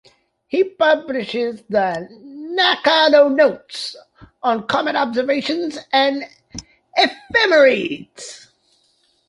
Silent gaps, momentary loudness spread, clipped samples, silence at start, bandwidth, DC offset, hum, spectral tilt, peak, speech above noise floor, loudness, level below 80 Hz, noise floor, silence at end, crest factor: none; 21 LU; under 0.1%; 0.55 s; 11.5 kHz; under 0.1%; none; -3.5 dB/octave; -2 dBFS; 44 dB; -17 LUFS; -58 dBFS; -62 dBFS; 0.9 s; 18 dB